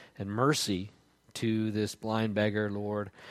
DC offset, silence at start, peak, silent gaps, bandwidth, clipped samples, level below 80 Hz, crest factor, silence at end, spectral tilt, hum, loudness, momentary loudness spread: under 0.1%; 0 s; -14 dBFS; none; 15.5 kHz; under 0.1%; -68 dBFS; 18 dB; 0 s; -5 dB/octave; none; -31 LUFS; 9 LU